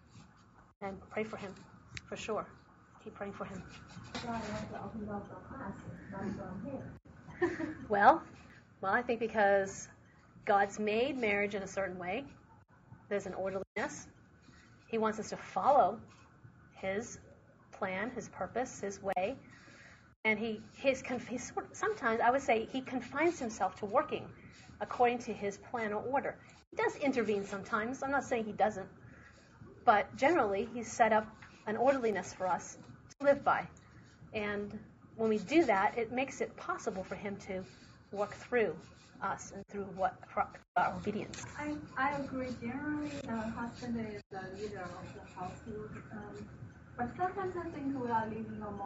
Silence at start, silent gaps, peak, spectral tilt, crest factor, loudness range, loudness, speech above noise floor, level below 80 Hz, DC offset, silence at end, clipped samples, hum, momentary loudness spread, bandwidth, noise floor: 0.15 s; 0.76-0.81 s, 13.67-13.75 s, 20.16-20.23 s, 26.67-26.71 s, 40.68-40.75 s, 44.26-44.30 s; -10 dBFS; -4 dB/octave; 26 dB; 11 LU; -35 LUFS; 26 dB; -64 dBFS; under 0.1%; 0 s; under 0.1%; none; 19 LU; 8 kHz; -61 dBFS